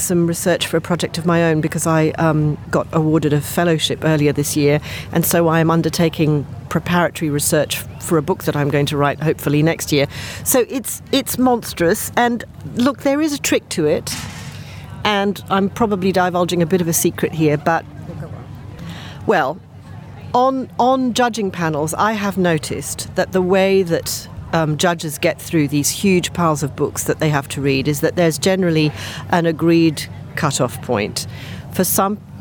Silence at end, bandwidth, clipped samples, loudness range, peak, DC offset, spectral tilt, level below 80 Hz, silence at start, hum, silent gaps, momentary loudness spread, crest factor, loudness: 0 s; over 20 kHz; under 0.1%; 3 LU; -2 dBFS; under 0.1%; -5 dB/octave; -46 dBFS; 0 s; none; none; 10 LU; 16 dB; -18 LUFS